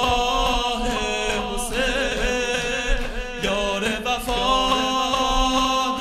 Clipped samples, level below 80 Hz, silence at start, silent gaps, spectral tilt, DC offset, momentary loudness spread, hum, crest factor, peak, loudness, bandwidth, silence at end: under 0.1%; -30 dBFS; 0 s; none; -2.5 dB/octave; under 0.1%; 5 LU; none; 16 dB; -6 dBFS; -22 LUFS; 14 kHz; 0 s